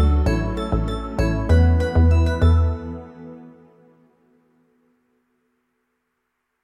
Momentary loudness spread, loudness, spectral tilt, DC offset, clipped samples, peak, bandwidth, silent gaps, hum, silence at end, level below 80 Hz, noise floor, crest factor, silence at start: 19 LU; -20 LUFS; -8 dB/octave; under 0.1%; under 0.1%; -6 dBFS; 8.4 kHz; none; none; 3.15 s; -24 dBFS; -75 dBFS; 16 dB; 0 s